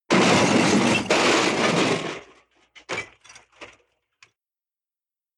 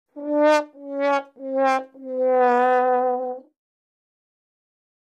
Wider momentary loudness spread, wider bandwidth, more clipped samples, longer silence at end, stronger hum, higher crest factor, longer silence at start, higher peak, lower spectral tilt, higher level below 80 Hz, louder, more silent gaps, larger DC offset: about the same, 15 LU vs 13 LU; first, 13 kHz vs 10 kHz; neither; about the same, 1.7 s vs 1.7 s; neither; about the same, 18 dB vs 16 dB; about the same, 0.1 s vs 0.15 s; about the same, -6 dBFS vs -6 dBFS; about the same, -3.5 dB/octave vs -3 dB/octave; first, -60 dBFS vs under -90 dBFS; about the same, -20 LUFS vs -21 LUFS; neither; neither